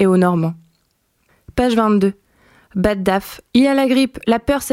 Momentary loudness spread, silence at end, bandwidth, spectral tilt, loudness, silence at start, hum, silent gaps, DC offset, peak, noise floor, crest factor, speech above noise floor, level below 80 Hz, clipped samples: 9 LU; 0 s; 16.5 kHz; -6 dB/octave; -17 LUFS; 0 s; none; none; under 0.1%; -2 dBFS; -64 dBFS; 16 dB; 49 dB; -40 dBFS; under 0.1%